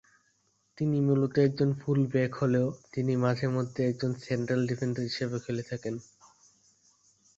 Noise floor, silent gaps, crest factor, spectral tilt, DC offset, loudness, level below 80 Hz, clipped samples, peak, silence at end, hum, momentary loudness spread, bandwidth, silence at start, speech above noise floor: -72 dBFS; none; 18 dB; -7.5 dB/octave; under 0.1%; -29 LUFS; -64 dBFS; under 0.1%; -12 dBFS; 1.35 s; none; 8 LU; 7.8 kHz; 0.75 s; 43 dB